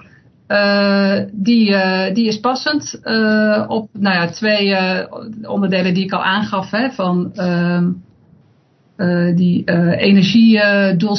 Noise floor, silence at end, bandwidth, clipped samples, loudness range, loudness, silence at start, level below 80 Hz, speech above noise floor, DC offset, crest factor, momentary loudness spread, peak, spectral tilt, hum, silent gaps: -54 dBFS; 0 s; 6.4 kHz; under 0.1%; 4 LU; -15 LUFS; 0.5 s; -58 dBFS; 39 dB; under 0.1%; 16 dB; 8 LU; 0 dBFS; -6.5 dB/octave; none; none